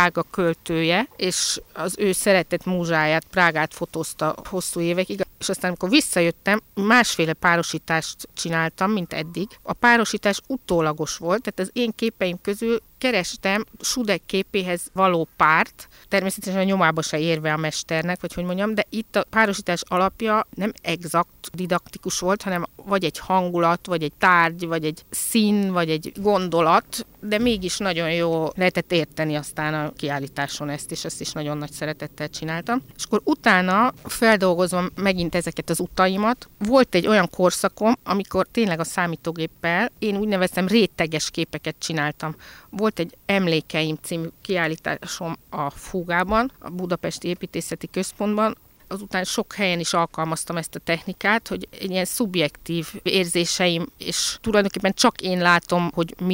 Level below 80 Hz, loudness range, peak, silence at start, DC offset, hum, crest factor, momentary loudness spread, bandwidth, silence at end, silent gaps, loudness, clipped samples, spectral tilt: -52 dBFS; 5 LU; -4 dBFS; 0 s; under 0.1%; none; 20 dB; 10 LU; 16 kHz; 0 s; none; -22 LUFS; under 0.1%; -4 dB/octave